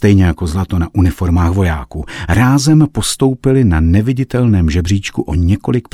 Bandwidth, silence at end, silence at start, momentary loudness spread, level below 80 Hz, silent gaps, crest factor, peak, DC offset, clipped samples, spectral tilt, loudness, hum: 14.5 kHz; 0.15 s; 0 s; 6 LU; -24 dBFS; none; 12 dB; 0 dBFS; under 0.1%; under 0.1%; -6.5 dB/octave; -13 LUFS; none